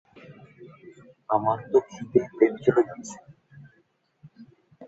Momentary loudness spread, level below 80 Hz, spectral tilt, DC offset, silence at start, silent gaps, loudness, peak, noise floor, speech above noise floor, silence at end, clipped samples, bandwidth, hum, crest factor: 20 LU; -68 dBFS; -7 dB/octave; under 0.1%; 0.3 s; none; -24 LUFS; -6 dBFS; -67 dBFS; 43 dB; 0.05 s; under 0.1%; 8 kHz; none; 22 dB